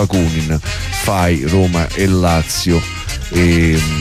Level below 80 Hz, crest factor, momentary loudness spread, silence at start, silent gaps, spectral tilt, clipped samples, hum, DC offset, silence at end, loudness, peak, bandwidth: -24 dBFS; 12 dB; 7 LU; 0 s; none; -5.5 dB/octave; under 0.1%; none; under 0.1%; 0 s; -15 LUFS; -4 dBFS; 15.5 kHz